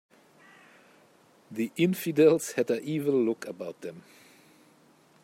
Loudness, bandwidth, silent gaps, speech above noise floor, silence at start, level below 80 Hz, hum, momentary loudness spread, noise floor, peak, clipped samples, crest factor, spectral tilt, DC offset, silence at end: -27 LUFS; 16 kHz; none; 34 dB; 1.5 s; -78 dBFS; none; 18 LU; -61 dBFS; -10 dBFS; under 0.1%; 20 dB; -6 dB/octave; under 0.1%; 1.25 s